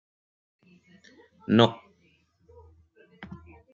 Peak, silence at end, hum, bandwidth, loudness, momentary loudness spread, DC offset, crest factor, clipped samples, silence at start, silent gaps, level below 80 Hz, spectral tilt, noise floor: -4 dBFS; 0.4 s; none; 7.4 kHz; -23 LUFS; 26 LU; under 0.1%; 28 dB; under 0.1%; 1.5 s; none; -66 dBFS; -4.5 dB/octave; -66 dBFS